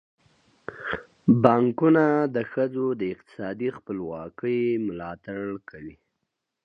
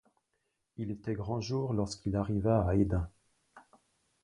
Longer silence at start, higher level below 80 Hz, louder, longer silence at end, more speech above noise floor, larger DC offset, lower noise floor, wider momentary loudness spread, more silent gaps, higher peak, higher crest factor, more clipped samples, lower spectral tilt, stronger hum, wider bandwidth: about the same, 0.7 s vs 0.8 s; second, -62 dBFS vs -48 dBFS; first, -25 LUFS vs -33 LUFS; about the same, 0.75 s vs 0.65 s; first, 57 dB vs 50 dB; neither; about the same, -81 dBFS vs -81 dBFS; first, 17 LU vs 13 LU; neither; first, -4 dBFS vs -14 dBFS; about the same, 22 dB vs 20 dB; neither; first, -9.5 dB/octave vs -7.5 dB/octave; neither; second, 6.4 kHz vs 10.5 kHz